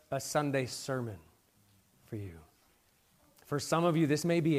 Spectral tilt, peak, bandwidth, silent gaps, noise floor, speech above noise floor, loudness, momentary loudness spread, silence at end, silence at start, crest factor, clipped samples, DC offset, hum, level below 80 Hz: -5.5 dB/octave; -16 dBFS; 15.5 kHz; none; -69 dBFS; 37 dB; -33 LUFS; 16 LU; 0 s; 0.1 s; 18 dB; under 0.1%; under 0.1%; none; -70 dBFS